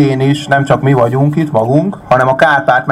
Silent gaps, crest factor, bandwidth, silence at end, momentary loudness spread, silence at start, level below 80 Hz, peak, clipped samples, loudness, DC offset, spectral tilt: none; 10 dB; 11.5 kHz; 0 s; 4 LU; 0 s; -44 dBFS; 0 dBFS; under 0.1%; -11 LUFS; under 0.1%; -7 dB/octave